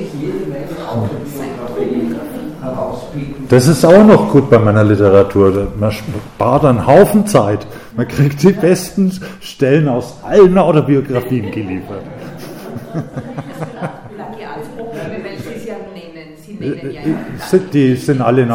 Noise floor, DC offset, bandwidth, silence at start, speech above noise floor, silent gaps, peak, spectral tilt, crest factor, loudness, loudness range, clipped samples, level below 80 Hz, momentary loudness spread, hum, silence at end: -34 dBFS; under 0.1%; 17 kHz; 0 s; 22 dB; none; 0 dBFS; -7 dB/octave; 14 dB; -13 LUFS; 16 LU; 1%; -40 dBFS; 19 LU; none; 0 s